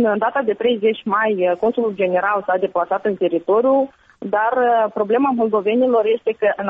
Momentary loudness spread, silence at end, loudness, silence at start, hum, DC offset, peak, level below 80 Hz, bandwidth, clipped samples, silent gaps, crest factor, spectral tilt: 4 LU; 0 s; -18 LUFS; 0 s; none; under 0.1%; -6 dBFS; -62 dBFS; 4.4 kHz; under 0.1%; none; 12 dB; -3.5 dB/octave